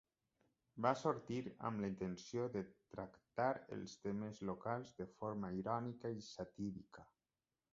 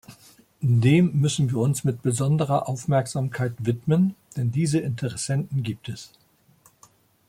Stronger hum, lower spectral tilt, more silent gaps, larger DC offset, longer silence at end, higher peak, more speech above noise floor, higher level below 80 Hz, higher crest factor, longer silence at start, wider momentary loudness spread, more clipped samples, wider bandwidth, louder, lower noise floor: neither; about the same, -6 dB/octave vs -6.5 dB/octave; neither; neither; second, 0.7 s vs 1.2 s; second, -22 dBFS vs -8 dBFS; first, over 46 dB vs 36 dB; second, -74 dBFS vs -58 dBFS; first, 24 dB vs 16 dB; first, 0.75 s vs 0.1 s; about the same, 12 LU vs 10 LU; neither; second, 7.6 kHz vs 15.5 kHz; second, -45 LUFS vs -24 LUFS; first, under -90 dBFS vs -59 dBFS